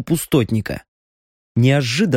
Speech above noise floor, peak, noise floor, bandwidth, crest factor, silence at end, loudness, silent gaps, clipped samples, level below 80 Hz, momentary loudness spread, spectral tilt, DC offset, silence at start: over 73 dB; -2 dBFS; under -90 dBFS; 16.5 kHz; 16 dB; 0 s; -18 LUFS; 0.88-1.55 s; under 0.1%; -46 dBFS; 12 LU; -6 dB/octave; under 0.1%; 0 s